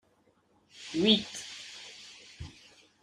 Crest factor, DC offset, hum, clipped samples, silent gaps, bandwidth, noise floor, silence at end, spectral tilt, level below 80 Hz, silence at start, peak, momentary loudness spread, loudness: 26 dB; under 0.1%; none; under 0.1%; none; 12 kHz; -68 dBFS; 0.55 s; -4 dB/octave; -64 dBFS; 0.8 s; -10 dBFS; 23 LU; -29 LUFS